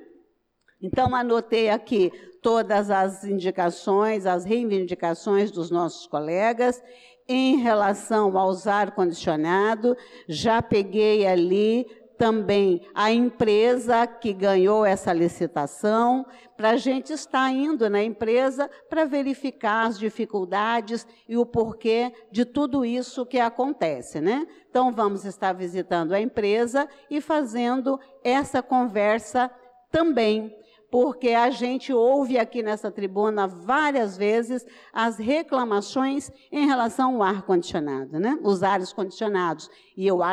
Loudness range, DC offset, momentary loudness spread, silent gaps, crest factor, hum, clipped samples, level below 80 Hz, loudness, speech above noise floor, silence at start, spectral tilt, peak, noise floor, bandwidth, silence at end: 4 LU; under 0.1%; 8 LU; none; 12 dB; none; under 0.1%; -58 dBFS; -24 LUFS; 43 dB; 0 s; -5.5 dB/octave; -12 dBFS; -66 dBFS; 12 kHz; 0 s